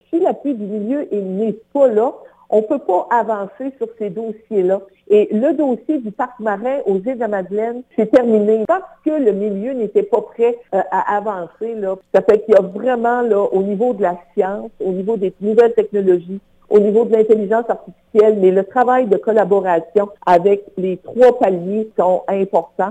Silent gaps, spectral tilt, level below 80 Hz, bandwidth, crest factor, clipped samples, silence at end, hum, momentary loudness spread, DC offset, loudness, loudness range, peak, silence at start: none; -8.5 dB/octave; -60 dBFS; 8.8 kHz; 14 dB; under 0.1%; 0 s; none; 10 LU; under 0.1%; -16 LUFS; 4 LU; -2 dBFS; 0.1 s